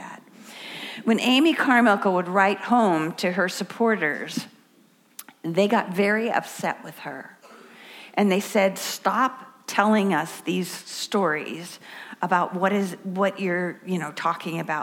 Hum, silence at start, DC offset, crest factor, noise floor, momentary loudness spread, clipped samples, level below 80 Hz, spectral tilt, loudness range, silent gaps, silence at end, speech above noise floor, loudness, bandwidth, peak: none; 0 s; under 0.1%; 20 dB; -58 dBFS; 19 LU; under 0.1%; -78 dBFS; -4.5 dB/octave; 5 LU; none; 0 s; 35 dB; -23 LUFS; 17 kHz; -4 dBFS